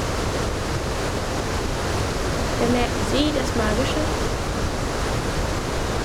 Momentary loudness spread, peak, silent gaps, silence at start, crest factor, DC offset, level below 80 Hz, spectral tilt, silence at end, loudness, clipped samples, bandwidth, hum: 4 LU; -8 dBFS; none; 0 s; 16 dB; under 0.1%; -30 dBFS; -4.5 dB/octave; 0 s; -24 LUFS; under 0.1%; 18 kHz; none